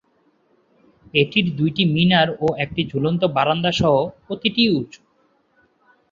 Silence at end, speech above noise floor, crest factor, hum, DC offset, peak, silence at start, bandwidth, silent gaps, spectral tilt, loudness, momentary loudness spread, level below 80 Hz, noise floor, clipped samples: 1.25 s; 43 dB; 20 dB; none; under 0.1%; -2 dBFS; 1.15 s; 7.4 kHz; none; -6.5 dB/octave; -19 LUFS; 7 LU; -52 dBFS; -62 dBFS; under 0.1%